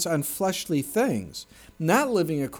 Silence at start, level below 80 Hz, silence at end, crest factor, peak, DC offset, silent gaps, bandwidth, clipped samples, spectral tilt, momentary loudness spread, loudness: 0 s; -58 dBFS; 0 s; 16 dB; -10 dBFS; under 0.1%; none; over 20 kHz; under 0.1%; -4.5 dB/octave; 10 LU; -25 LUFS